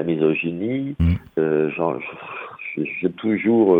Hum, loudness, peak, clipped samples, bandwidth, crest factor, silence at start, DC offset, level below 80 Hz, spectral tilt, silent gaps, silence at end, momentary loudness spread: none; -22 LUFS; -4 dBFS; under 0.1%; 4.5 kHz; 16 dB; 0 s; under 0.1%; -42 dBFS; -10 dB/octave; none; 0 s; 12 LU